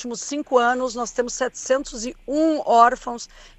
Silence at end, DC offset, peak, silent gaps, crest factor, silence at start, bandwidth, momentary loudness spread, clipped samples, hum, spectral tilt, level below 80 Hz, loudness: 0.1 s; under 0.1%; -2 dBFS; none; 20 dB; 0 s; 8.6 kHz; 15 LU; under 0.1%; none; -2.5 dB/octave; -50 dBFS; -21 LUFS